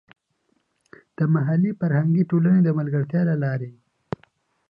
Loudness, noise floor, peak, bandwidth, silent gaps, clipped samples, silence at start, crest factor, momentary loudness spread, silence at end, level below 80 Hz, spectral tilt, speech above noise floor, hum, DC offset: -21 LUFS; -70 dBFS; -8 dBFS; 4.9 kHz; none; under 0.1%; 1.2 s; 14 dB; 18 LU; 1 s; -64 dBFS; -12 dB/octave; 49 dB; none; under 0.1%